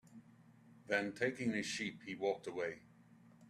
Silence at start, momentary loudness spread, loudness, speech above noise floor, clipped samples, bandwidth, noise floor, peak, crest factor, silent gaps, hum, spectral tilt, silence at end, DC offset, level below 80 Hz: 0.05 s; 15 LU; -40 LUFS; 24 dB; under 0.1%; 13.5 kHz; -64 dBFS; -20 dBFS; 22 dB; none; none; -4 dB/octave; 0 s; under 0.1%; -80 dBFS